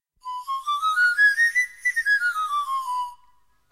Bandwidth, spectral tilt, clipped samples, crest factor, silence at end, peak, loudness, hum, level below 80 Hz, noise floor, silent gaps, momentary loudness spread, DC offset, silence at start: 16 kHz; 4.5 dB/octave; under 0.1%; 14 dB; 0.6 s; -10 dBFS; -21 LUFS; none; -68 dBFS; -62 dBFS; none; 13 LU; 0.1%; 0.25 s